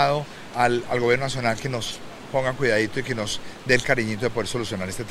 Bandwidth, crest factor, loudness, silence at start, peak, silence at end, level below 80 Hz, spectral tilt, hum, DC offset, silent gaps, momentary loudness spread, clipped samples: 16 kHz; 22 dB; -24 LUFS; 0 s; -2 dBFS; 0 s; -46 dBFS; -4.5 dB/octave; none; under 0.1%; none; 8 LU; under 0.1%